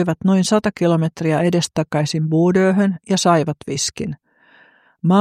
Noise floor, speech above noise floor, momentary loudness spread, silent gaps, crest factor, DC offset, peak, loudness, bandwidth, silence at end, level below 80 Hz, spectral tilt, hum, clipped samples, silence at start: -52 dBFS; 35 dB; 8 LU; none; 16 dB; under 0.1%; -2 dBFS; -18 LUFS; 14.5 kHz; 0 s; -54 dBFS; -5.5 dB/octave; none; under 0.1%; 0 s